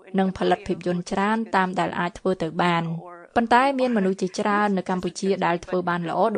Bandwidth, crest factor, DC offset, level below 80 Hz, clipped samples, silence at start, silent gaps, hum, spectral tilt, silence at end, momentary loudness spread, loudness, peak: 10.5 kHz; 18 dB; under 0.1%; -56 dBFS; under 0.1%; 0.05 s; none; none; -6 dB/octave; 0 s; 6 LU; -23 LUFS; -4 dBFS